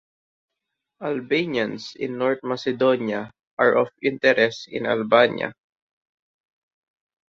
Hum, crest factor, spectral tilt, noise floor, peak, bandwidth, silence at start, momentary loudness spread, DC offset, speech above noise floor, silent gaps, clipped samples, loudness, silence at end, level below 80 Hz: none; 22 dB; -5.5 dB/octave; -82 dBFS; -2 dBFS; 7.4 kHz; 1 s; 12 LU; under 0.1%; 61 dB; 3.47-3.57 s; under 0.1%; -22 LUFS; 1.75 s; -68 dBFS